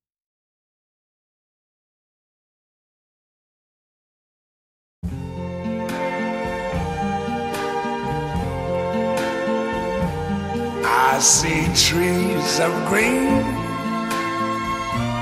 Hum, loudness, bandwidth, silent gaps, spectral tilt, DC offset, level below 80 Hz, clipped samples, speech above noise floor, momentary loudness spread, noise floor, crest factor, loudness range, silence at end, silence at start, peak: none; -21 LUFS; 16 kHz; none; -3.5 dB/octave; under 0.1%; -42 dBFS; under 0.1%; over 72 dB; 10 LU; under -90 dBFS; 20 dB; 13 LU; 0 s; 5.05 s; -4 dBFS